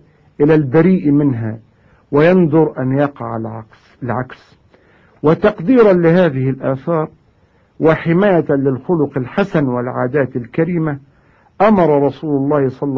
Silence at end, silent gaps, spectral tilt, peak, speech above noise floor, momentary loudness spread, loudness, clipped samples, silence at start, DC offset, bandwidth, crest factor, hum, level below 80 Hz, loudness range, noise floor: 0 s; none; -10 dB/octave; 0 dBFS; 40 dB; 12 LU; -15 LUFS; under 0.1%; 0.4 s; under 0.1%; 6.2 kHz; 14 dB; none; -48 dBFS; 3 LU; -53 dBFS